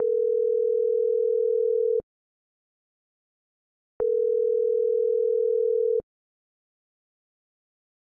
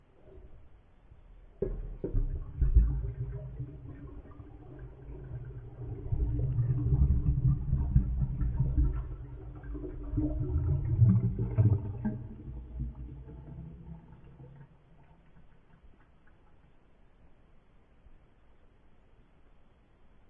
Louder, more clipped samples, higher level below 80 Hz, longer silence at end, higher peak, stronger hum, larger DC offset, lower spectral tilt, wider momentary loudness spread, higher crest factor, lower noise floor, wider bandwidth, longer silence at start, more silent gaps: first, -24 LUFS vs -32 LUFS; neither; second, -70 dBFS vs -36 dBFS; second, 2 s vs 2.15 s; second, -16 dBFS vs -10 dBFS; neither; neither; second, -9.5 dB/octave vs -13 dB/octave; second, 3 LU vs 21 LU; second, 10 dB vs 22 dB; first, under -90 dBFS vs -59 dBFS; second, 1.5 kHz vs 2.8 kHz; second, 0 s vs 0.25 s; first, 2.03-4.00 s vs none